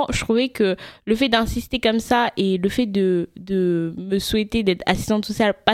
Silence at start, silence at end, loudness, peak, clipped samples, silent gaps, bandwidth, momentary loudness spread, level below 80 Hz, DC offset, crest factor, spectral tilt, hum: 0 s; 0 s; -21 LUFS; 0 dBFS; under 0.1%; none; 16 kHz; 5 LU; -40 dBFS; under 0.1%; 20 dB; -5 dB/octave; none